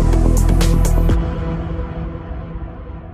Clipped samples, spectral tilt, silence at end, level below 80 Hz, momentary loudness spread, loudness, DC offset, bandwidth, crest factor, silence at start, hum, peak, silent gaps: under 0.1%; -6.5 dB/octave; 0 s; -18 dBFS; 15 LU; -19 LUFS; under 0.1%; 14.5 kHz; 14 dB; 0 s; none; -2 dBFS; none